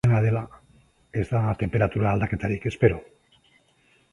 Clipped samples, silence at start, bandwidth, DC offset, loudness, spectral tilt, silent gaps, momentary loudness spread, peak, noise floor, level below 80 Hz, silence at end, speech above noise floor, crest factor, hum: under 0.1%; 0.05 s; 10.5 kHz; under 0.1%; -25 LUFS; -9 dB/octave; none; 9 LU; -4 dBFS; -62 dBFS; -44 dBFS; 1.1 s; 39 dB; 20 dB; none